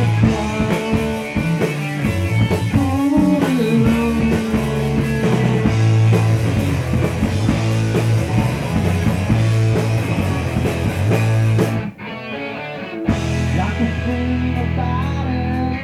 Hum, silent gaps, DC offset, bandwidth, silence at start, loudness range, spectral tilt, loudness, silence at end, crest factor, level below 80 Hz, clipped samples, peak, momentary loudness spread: none; none; under 0.1%; 14.5 kHz; 0 s; 4 LU; -7 dB/octave; -18 LUFS; 0 s; 16 dB; -32 dBFS; under 0.1%; -2 dBFS; 6 LU